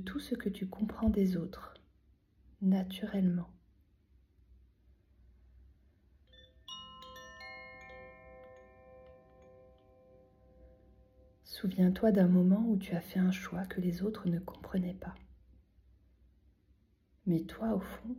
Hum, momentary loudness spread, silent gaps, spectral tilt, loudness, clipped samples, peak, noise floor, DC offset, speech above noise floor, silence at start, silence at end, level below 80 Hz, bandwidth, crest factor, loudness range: none; 23 LU; none; -8 dB/octave; -33 LUFS; under 0.1%; -16 dBFS; -70 dBFS; under 0.1%; 38 dB; 0 s; 0 s; -58 dBFS; 15 kHz; 20 dB; 22 LU